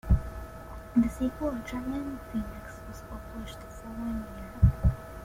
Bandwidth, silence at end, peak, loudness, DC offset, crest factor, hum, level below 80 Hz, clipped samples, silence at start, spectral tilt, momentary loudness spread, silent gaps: 16 kHz; 0 s; -10 dBFS; -31 LUFS; under 0.1%; 20 dB; none; -36 dBFS; under 0.1%; 0.05 s; -8 dB/octave; 17 LU; none